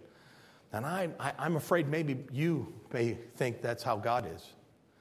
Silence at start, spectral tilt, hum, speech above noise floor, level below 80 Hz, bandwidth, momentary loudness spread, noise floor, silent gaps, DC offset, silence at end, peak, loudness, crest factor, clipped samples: 0 s; -6.5 dB/octave; none; 25 dB; -66 dBFS; 16 kHz; 9 LU; -59 dBFS; none; under 0.1%; 0.5 s; -14 dBFS; -34 LUFS; 20 dB; under 0.1%